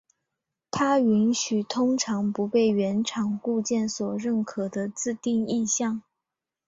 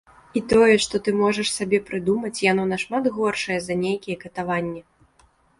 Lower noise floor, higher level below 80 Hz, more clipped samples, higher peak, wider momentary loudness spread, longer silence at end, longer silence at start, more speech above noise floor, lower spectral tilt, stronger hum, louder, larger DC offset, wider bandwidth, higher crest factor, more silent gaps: first, -87 dBFS vs -59 dBFS; second, -66 dBFS vs -54 dBFS; neither; second, -12 dBFS vs -6 dBFS; second, 8 LU vs 12 LU; about the same, 0.7 s vs 0.8 s; first, 0.75 s vs 0.35 s; first, 62 dB vs 38 dB; about the same, -4.5 dB/octave vs -4.5 dB/octave; neither; second, -25 LUFS vs -22 LUFS; neither; second, 8 kHz vs 11.5 kHz; about the same, 14 dB vs 18 dB; neither